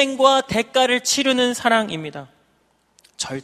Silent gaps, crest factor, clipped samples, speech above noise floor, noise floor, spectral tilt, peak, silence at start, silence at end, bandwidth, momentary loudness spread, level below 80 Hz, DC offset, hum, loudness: none; 20 dB; under 0.1%; 44 dB; -63 dBFS; -2.5 dB/octave; 0 dBFS; 0 s; 0 s; 15 kHz; 14 LU; -58 dBFS; under 0.1%; none; -18 LUFS